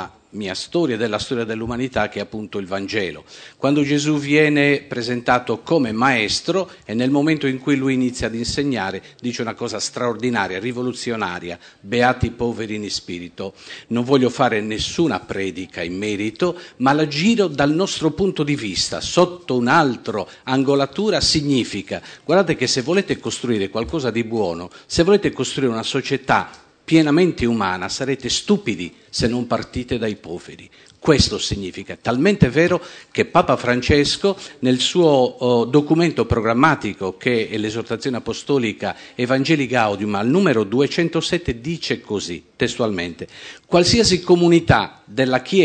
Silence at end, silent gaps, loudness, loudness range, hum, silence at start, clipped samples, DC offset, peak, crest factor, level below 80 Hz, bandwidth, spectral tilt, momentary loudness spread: 0 s; none; -19 LUFS; 5 LU; none; 0 s; under 0.1%; under 0.1%; 0 dBFS; 18 dB; -42 dBFS; 9.4 kHz; -5 dB/octave; 11 LU